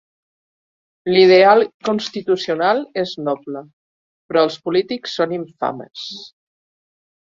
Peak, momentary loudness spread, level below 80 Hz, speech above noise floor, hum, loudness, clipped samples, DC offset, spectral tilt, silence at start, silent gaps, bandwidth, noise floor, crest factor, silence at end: -2 dBFS; 19 LU; -64 dBFS; over 73 dB; none; -17 LUFS; under 0.1%; under 0.1%; -5.5 dB/octave; 1.05 s; 1.74-1.80 s, 3.73-4.29 s; 7.4 kHz; under -90 dBFS; 18 dB; 1.1 s